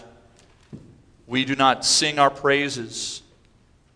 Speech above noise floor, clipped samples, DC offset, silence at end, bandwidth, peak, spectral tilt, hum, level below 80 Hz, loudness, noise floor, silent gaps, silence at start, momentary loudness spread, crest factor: 36 dB; under 0.1%; under 0.1%; 0.75 s; 11 kHz; -4 dBFS; -2.5 dB/octave; none; -58 dBFS; -20 LUFS; -57 dBFS; none; 0.75 s; 13 LU; 20 dB